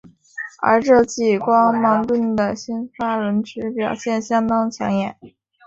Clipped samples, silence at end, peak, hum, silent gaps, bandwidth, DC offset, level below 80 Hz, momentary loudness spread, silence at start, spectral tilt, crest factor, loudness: under 0.1%; 0.4 s; -2 dBFS; none; none; 7.8 kHz; under 0.1%; -54 dBFS; 12 LU; 0.35 s; -5.5 dB/octave; 18 dB; -19 LUFS